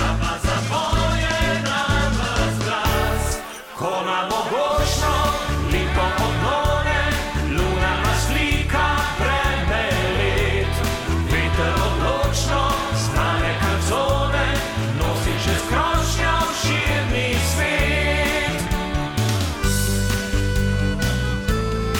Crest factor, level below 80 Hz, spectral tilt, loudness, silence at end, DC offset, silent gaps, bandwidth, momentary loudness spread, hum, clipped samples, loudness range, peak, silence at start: 12 dB; -26 dBFS; -4.5 dB/octave; -21 LUFS; 0 s; under 0.1%; none; 17.5 kHz; 3 LU; none; under 0.1%; 2 LU; -8 dBFS; 0 s